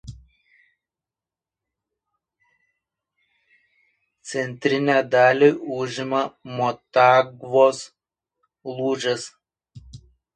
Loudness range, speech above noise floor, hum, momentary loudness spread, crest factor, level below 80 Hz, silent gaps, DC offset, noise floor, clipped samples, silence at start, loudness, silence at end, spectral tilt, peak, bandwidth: 8 LU; 70 dB; none; 19 LU; 22 dB; -60 dBFS; none; under 0.1%; -90 dBFS; under 0.1%; 0.05 s; -20 LUFS; 0.4 s; -5 dB/octave; -2 dBFS; 10 kHz